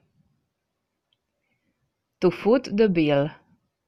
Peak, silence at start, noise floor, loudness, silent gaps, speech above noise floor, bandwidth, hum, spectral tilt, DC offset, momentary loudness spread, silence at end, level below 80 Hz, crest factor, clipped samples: -8 dBFS; 2.2 s; -80 dBFS; -22 LUFS; none; 59 dB; 7.6 kHz; none; -7.5 dB/octave; under 0.1%; 5 LU; 0.55 s; -58 dBFS; 18 dB; under 0.1%